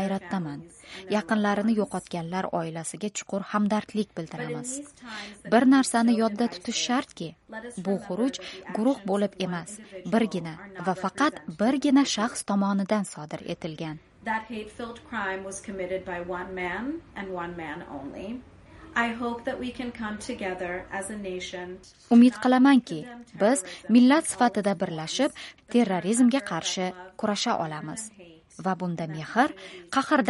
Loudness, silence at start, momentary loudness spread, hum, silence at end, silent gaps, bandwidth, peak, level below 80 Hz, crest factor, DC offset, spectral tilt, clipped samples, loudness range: -27 LUFS; 0 s; 17 LU; none; 0 s; none; 11.5 kHz; -8 dBFS; -60 dBFS; 20 dB; under 0.1%; -4.5 dB/octave; under 0.1%; 10 LU